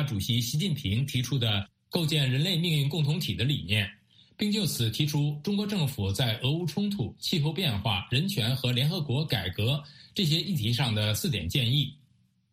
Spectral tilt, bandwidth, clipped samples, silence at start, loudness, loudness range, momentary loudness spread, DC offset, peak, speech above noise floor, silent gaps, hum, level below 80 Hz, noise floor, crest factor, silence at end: -5 dB/octave; 15.5 kHz; under 0.1%; 0 s; -28 LUFS; 1 LU; 4 LU; under 0.1%; -10 dBFS; 38 dB; none; none; -54 dBFS; -66 dBFS; 18 dB; 0.6 s